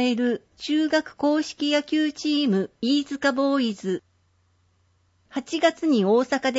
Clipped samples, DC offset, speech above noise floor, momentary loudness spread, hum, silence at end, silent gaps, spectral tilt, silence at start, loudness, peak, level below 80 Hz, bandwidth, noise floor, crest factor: under 0.1%; under 0.1%; 42 dB; 9 LU; none; 0 s; none; -5 dB/octave; 0 s; -24 LUFS; -8 dBFS; -68 dBFS; 8 kHz; -65 dBFS; 16 dB